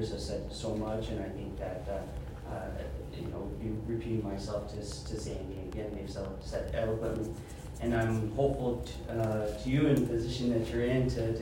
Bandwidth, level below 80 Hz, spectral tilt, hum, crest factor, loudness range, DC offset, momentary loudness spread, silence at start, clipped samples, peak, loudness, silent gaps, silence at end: 16 kHz; -44 dBFS; -7 dB/octave; none; 18 dB; 7 LU; under 0.1%; 10 LU; 0 s; under 0.1%; -14 dBFS; -35 LUFS; none; 0 s